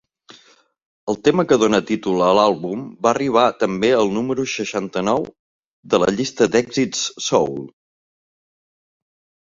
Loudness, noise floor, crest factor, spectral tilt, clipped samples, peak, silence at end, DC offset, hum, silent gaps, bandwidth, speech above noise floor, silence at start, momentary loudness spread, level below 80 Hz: -19 LUFS; -54 dBFS; 18 dB; -4.5 dB/octave; under 0.1%; -2 dBFS; 1.75 s; under 0.1%; none; 0.85-1.07 s, 5.39-5.83 s; 7.8 kHz; 36 dB; 0.3 s; 9 LU; -56 dBFS